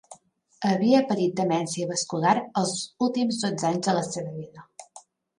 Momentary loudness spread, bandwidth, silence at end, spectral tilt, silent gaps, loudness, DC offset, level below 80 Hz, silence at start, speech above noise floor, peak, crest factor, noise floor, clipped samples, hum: 17 LU; 11.5 kHz; 0.4 s; -5 dB/octave; none; -25 LUFS; under 0.1%; -72 dBFS; 0.1 s; 31 dB; -8 dBFS; 18 dB; -56 dBFS; under 0.1%; none